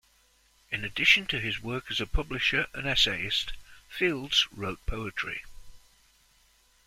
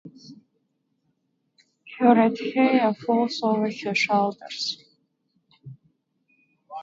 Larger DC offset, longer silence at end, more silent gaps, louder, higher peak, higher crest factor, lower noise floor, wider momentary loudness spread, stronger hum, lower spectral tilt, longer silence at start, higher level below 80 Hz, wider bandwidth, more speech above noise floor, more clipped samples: neither; first, 1.1 s vs 0 s; neither; second, -27 LUFS vs -22 LUFS; about the same, -6 dBFS vs -4 dBFS; about the same, 24 dB vs 22 dB; second, -65 dBFS vs -73 dBFS; first, 14 LU vs 11 LU; neither; second, -3 dB/octave vs -5 dB/octave; first, 0.7 s vs 0.05 s; first, -44 dBFS vs -74 dBFS; first, 16 kHz vs 7.8 kHz; second, 36 dB vs 51 dB; neither